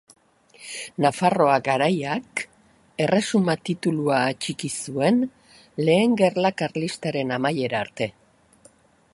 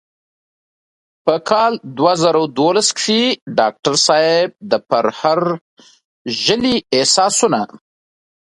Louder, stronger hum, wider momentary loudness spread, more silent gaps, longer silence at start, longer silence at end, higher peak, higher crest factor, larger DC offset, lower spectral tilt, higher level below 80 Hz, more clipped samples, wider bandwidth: second, -23 LUFS vs -15 LUFS; neither; first, 12 LU vs 9 LU; second, none vs 3.42-3.46 s, 3.79-3.83 s, 5.61-5.77 s, 6.05-6.25 s; second, 0.6 s vs 1.25 s; first, 1.05 s vs 0.7 s; second, -4 dBFS vs 0 dBFS; about the same, 20 dB vs 16 dB; neither; first, -5.5 dB/octave vs -3 dB/octave; second, -64 dBFS vs -58 dBFS; neither; about the same, 11.5 kHz vs 11.5 kHz